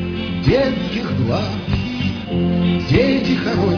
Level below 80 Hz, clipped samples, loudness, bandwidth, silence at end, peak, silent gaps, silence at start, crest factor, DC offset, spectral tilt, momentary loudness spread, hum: -34 dBFS; under 0.1%; -18 LUFS; 5.4 kHz; 0 s; 0 dBFS; none; 0 s; 16 dB; under 0.1%; -7.5 dB/octave; 6 LU; none